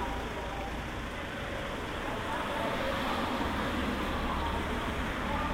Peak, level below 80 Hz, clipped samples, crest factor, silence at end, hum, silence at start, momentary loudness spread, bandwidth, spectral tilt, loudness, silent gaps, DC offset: -18 dBFS; -42 dBFS; under 0.1%; 14 dB; 0 s; none; 0 s; 5 LU; 16 kHz; -5 dB/octave; -34 LUFS; none; under 0.1%